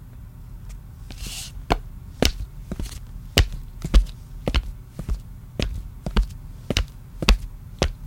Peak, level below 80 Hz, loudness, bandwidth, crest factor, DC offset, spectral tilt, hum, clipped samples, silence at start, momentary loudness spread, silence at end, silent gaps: 0 dBFS; -26 dBFS; -27 LUFS; 17 kHz; 26 dB; under 0.1%; -4.5 dB/octave; none; under 0.1%; 0 s; 18 LU; 0 s; none